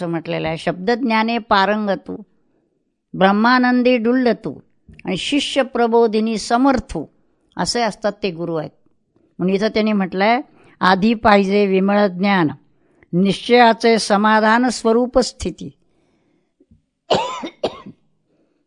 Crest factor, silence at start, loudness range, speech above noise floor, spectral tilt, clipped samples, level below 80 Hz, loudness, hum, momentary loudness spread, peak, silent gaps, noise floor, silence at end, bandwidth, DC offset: 18 dB; 0 s; 6 LU; 51 dB; -5 dB/octave; under 0.1%; -48 dBFS; -17 LUFS; none; 13 LU; 0 dBFS; none; -68 dBFS; 0.75 s; 11 kHz; under 0.1%